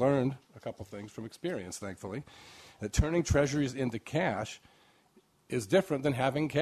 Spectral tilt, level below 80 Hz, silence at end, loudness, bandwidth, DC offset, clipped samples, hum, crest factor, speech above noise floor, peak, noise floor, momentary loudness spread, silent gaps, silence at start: -6 dB/octave; -46 dBFS; 0 s; -32 LUFS; 14 kHz; under 0.1%; under 0.1%; none; 20 dB; 35 dB; -14 dBFS; -66 dBFS; 16 LU; none; 0 s